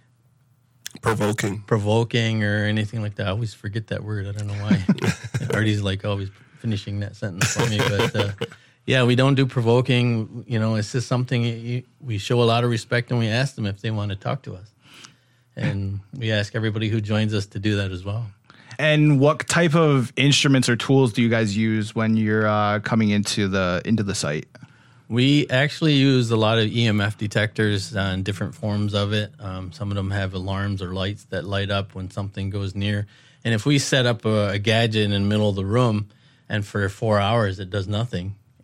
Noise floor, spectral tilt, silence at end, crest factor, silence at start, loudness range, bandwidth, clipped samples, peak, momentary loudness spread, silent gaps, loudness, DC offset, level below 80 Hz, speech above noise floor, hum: -60 dBFS; -5.5 dB/octave; 0.3 s; 20 dB; 1.05 s; 7 LU; 14.5 kHz; under 0.1%; -2 dBFS; 11 LU; none; -22 LUFS; under 0.1%; -58 dBFS; 38 dB; none